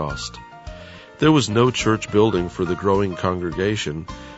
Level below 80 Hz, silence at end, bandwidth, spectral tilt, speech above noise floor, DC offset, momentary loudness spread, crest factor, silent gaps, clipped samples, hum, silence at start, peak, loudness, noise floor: -42 dBFS; 0 s; 8 kHz; -5.5 dB/octave; 19 dB; under 0.1%; 21 LU; 18 dB; none; under 0.1%; none; 0 s; -4 dBFS; -20 LUFS; -40 dBFS